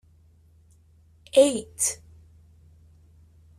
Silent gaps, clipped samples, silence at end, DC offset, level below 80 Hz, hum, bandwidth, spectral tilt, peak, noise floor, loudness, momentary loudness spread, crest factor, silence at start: none; under 0.1%; 1.65 s; under 0.1%; -60 dBFS; none; 13.5 kHz; -2.5 dB/octave; -6 dBFS; -57 dBFS; -23 LUFS; 8 LU; 22 dB; 1.35 s